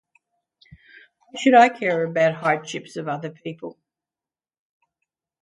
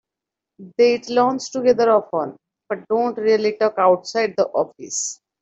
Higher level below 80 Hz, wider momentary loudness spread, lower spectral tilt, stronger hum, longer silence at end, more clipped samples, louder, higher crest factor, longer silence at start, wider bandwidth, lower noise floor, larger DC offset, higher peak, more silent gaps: about the same, -70 dBFS vs -66 dBFS; first, 21 LU vs 10 LU; first, -5 dB/octave vs -3.5 dB/octave; neither; first, 1.75 s vs 0.3 s; neither; about the same, -20 LUFS vs -19 LUFS; first, 22 dB vs 16 dB; first, 1.35 s vs 0.6 s; first, 11 kHz vs 8.2 kHz; first, under -90 dBFS vs -85 dBFS; neither; about the same, -2 dBFS vs -4 dBFS; neither